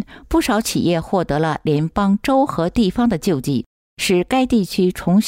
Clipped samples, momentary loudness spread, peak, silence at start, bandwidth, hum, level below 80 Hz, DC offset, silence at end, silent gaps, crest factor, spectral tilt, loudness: under 0.1%; 4 LU; -6 dBFS; 0 s; 16 kHz; none; -38 dBFS; under 0.1%; 0 s; 3.66-3.97 s; 12 dB; -5.5 dB/octave; -18 LUFS